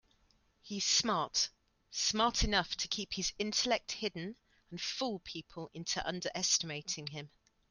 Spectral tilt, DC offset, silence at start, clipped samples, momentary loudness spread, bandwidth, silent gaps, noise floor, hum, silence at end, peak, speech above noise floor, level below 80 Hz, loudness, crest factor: -2 dB/octave; under 0.1%; 0.65 s; under 0.1%; 15 LU; 11.5 kHz; none; -71 dBFS; none; 0.45 s; -16 dBFS; 36 dB; -52 dBFS; -34 LUFS; 22 dB